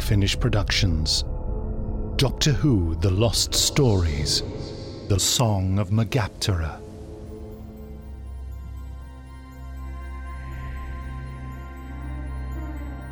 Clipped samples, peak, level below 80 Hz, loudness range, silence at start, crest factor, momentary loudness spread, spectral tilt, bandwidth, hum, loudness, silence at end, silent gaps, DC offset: under 0.1%; -6 dBFS; -32 dBFS; 16 LU; 0 s; 18 dB; 19 LU; -4.5 dB/octave; 17 kHz; none; -24 LUFS; 0 s; none; under 0.1%